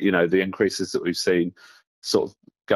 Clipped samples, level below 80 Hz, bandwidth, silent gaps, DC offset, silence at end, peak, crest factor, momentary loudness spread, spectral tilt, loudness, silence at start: under 0.1%; -62 dBFS; 14.5 kHz; 1.87-2.02 s; under 0.1%; 0 s; -6 dBFS; 18 dB; 10 LU; -4.5 dB/octave; -23 LUFS; 0 s